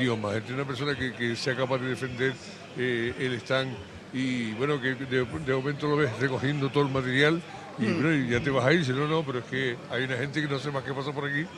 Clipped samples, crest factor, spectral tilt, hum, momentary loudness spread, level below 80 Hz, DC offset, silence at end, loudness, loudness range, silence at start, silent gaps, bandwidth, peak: under 0.1%; 20 dB; -6 dB/octave; none; 8 LU; -58 dBFS; under 0.1%; 0 s; -28 LUFS; 4 LU; 0 s; none; 11.5 kHz; -8 dBFS